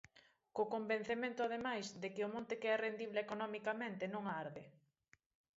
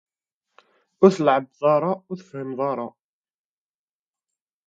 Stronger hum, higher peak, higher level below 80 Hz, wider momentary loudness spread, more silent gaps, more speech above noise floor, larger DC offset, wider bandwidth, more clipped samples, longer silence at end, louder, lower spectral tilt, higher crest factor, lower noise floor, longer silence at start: neither; second, -26 dBFS vs -2 dBFS; second, -82 dBFS vs -72 dBFS; second, 7 LU vs 16 LU; neither; second, 34 dB vs over 69 dB; neither; about the same, 7.6 kHz vs 7.8 kHz; neither; second, 0.85 s vs 1.8 s; second, -42 LUFS vs -22 LUFS; second, -3 dB/octave vs -7 dB/octave; second, 18 dB vs 24 dB; second, -76 dBFS vs under -90 dBFS; second, 0.15 s vs 1 s